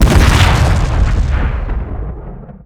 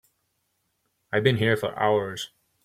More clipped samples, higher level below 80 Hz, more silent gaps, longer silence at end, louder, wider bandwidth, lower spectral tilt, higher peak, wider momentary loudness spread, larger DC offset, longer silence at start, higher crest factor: first, 0.5% vs under 0.1%; first, -14 dBFS vs -62 dBFS; neither; second, 0.05 s vs 0.4 s; first, -14 LUFS vs -24 LUFS; about the same, 15.5 kHz vs 16 kHz; about the same, -5.5 dB/octave vs -5.5 dB/octave; first, 0 dBFS vs -6 dBFS; first, 17 LU vs 13 LU; neither; second, 0 s vs 1.1 s; second, 12 dB vs 22 dB